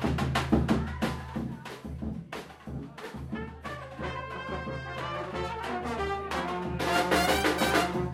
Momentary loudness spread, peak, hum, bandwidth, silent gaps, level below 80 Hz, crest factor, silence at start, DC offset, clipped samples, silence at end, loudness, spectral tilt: 15 LU; -10 dBFS; none; 16 kHz; none; -44 dBFS; 20 dB; 0 s; under 0.1%; under 0.1%; 0 s; -31 LUFS; -5 dB/octave